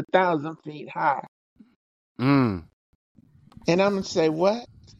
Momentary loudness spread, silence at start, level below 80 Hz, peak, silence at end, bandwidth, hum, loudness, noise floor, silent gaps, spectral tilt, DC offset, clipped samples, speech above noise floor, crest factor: 14 LU; 0 s; -60 dBFS; -6 dBFS; 0.35 s; 7.8 kHz; none; -24 LUFS; -51 dBFS; 1.28-1.56 s, 1.76-2.15 s, 2.73-3.15 s; -6.5 dB/octave; under 0.1%; under 0.1%; 28 dB; 20 dB